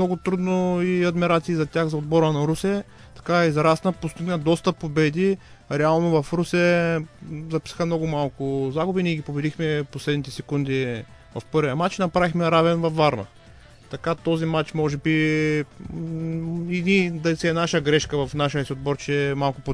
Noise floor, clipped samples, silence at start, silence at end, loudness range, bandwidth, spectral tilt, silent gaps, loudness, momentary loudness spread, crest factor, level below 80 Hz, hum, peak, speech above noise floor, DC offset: -48 dBFS; under 0.1%; 0 s; 0 s; 3 LU; 11 kHz; -6.5 dB/octave; none; -23 LUFS; 10 LU; 18 dB; -50 dBFS; none; -6 dBFS; 25 dB; under 0.1%